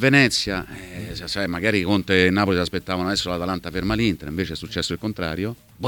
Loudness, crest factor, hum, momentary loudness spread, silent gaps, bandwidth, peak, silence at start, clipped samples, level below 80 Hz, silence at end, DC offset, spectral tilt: -22 LUFS; 18 dB; none; 12 LU; none; 19 kHz; -4 dBFS; 0 s; under 0.1%; -44 dBFS; 0 s; under 0.1%; -5 dB/octave